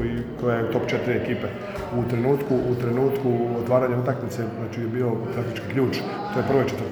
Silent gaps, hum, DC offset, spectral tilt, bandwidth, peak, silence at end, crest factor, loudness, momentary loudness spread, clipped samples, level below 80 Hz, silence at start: none; none; under 0.1%; -7.5 dB/octave; over 20 kHz; -6 dBFS; 0 s; 18 dB; -24 LUFS; 7 LU; under 0.1%; -48 dBFS; 0 s